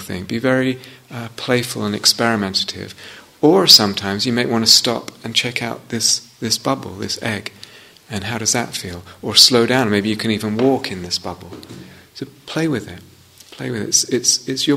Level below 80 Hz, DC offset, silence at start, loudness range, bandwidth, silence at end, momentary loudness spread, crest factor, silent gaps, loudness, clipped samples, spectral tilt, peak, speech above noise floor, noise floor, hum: -56 dBFS; under 0.1%; 0 s; 9 LU; 16 kHz; 0 s; 21 LU; 18 dB; none; -16 LUFS; under 0.1%; -2.5 dB/octave; 0 dBFS; 24 dB; -42 dBFS; none